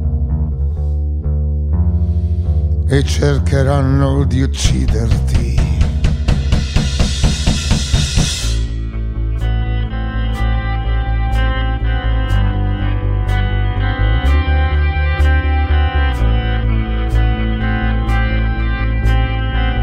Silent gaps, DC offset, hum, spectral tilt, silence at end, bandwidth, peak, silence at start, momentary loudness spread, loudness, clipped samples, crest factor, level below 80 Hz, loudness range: none; under 0.1%; none; -5.5 dB/octave; 0 s; 11 kHz; 0 dBFS; 0 s; 5 LU; -16 LUFS; under 0.1%; 14 dB; -16 dBFS; 3 LU